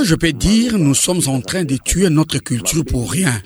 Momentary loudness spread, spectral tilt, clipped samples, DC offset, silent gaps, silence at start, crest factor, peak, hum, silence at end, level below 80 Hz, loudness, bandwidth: 5 LU; -4.5 dB/octave; under 0.1%; under 0.1%; none; 0 s; 14 dB; -2 dBFS; none; 0.05 s; -30 dBFS; -16 LUFS; over 20 kHz